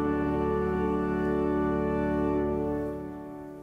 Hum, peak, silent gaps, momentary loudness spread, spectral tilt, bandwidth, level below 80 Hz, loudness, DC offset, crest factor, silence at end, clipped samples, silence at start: none; -16 dBFS; none; 10 LU; -9.5 dB/octave; 7.2 kHz; -42 dBFS; -28 LUFS; under 0.1%; 12 dB; 0 s; under 0.1%; 0 s